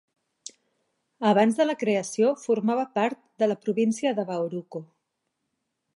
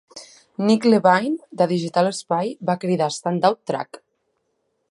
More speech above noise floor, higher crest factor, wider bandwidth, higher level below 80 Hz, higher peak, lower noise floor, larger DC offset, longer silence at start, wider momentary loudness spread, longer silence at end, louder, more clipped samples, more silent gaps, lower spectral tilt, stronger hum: about the same, 55 dB vs 52 dB; about the same, 18 dB vs 20 dB; about the same, 11.5 kHz vs 11.5 kHz; second, -80 dBFS vs -72 dBFS; second, -8 dBFS vs -2 dBFS; first, -80 dBFS vs -72 dBFS; neither; first, 1.2 s vs 0.15 s; first, 19 LU vs 14 LU; first, 1.1 s vs 0.95 s; second, -25 LUFS vs -20 LUFS; neither; neither; about the same, -5.5 dB/octave vs -5.5 dB/octave; neither